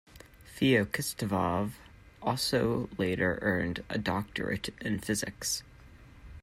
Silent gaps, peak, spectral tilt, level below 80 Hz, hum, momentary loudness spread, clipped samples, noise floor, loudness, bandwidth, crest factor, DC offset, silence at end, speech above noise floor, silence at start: none; -14 dBFS; -4.5 dB/octave; -54 dBFS; none; 8 LU; under 0.1%; -53 dBFS; -31 LUFS; 16 kHz; 18 dB; under 0.1%; 0 s; 22 dB; 0.15 s